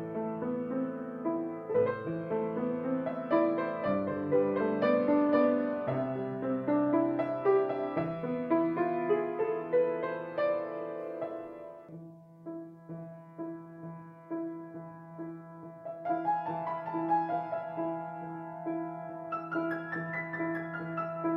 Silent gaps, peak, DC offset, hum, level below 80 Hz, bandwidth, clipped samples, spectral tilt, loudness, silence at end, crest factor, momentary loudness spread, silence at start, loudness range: none; -16 dBFS; under 0.1%; none; -74 dBFS; 5.2 kHz; under 0.1%; -10 dB/octave; -32 LUFS; 0 s; 18 dB; 17 LU; 0 s; 14 LU